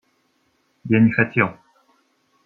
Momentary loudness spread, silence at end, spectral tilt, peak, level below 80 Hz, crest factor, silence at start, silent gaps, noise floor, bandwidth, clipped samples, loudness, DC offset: 9 LU; 0.95 s; -10 dB/octave; -2 dBFS; -64 dBFS; 20 dB; 0.85 s; none; -66 dBFS; 4.3 kHz; under 0.1%; -18 LUFS; under 0.1%